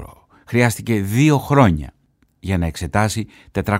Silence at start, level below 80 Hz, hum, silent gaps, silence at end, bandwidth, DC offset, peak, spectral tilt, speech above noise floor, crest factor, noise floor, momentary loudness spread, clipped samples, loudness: 0 s; -38 dBFS; none; none; 0 s; 16 kHz; under 0.1%; -2 dBFS; -6 dB/octave; 23 dB; 18 dB; -41 dBFS; 12 LU; under 0.1%; -18 LUFS